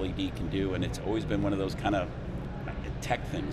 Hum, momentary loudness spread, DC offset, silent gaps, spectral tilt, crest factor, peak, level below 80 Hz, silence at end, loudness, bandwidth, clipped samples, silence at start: none; 8 LU; under 0.1%; none; -6.5 dB/octave; 18 dB; -14 dBFS; -42 dBFS; 0 s; -32 LUFS; 13.5 kHz; under 0.1%; 0 s